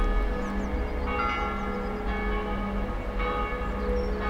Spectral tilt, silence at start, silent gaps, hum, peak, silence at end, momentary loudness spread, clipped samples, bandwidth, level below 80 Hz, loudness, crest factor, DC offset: -7 dB/octave; 0 s; none; none; -14 dBFS; 0 s; 4 LU; under 0.1%; 7.6 kHz; -30 dBFS; -30 LUFS; 14 dB; under 0.1%